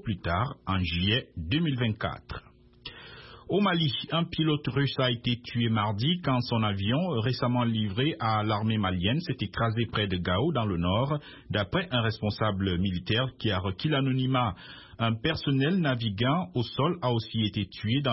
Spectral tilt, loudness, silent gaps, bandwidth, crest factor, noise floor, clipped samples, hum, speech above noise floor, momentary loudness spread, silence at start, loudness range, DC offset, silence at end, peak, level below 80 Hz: -10 dB/octave; -28 LUFS; none; 5.8 kHz; 16 dB; -48 dBFS; under 0.1%; none; 20 dB; 6 LU; 0 s; 2 LU; under 0.1%; 0 s; -12 dBFS; -52 dBFS